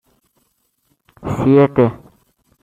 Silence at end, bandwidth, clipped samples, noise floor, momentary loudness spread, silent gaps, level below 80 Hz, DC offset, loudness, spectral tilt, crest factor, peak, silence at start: 0.7 s; 7.8 kHz; under 0.1%; -65 dBFS; 14 LU; none; -46 dBFS; under 0.1%; -15 LUFS; -9 dB/octave; 16 dB; -2 dBFS; 1.25 s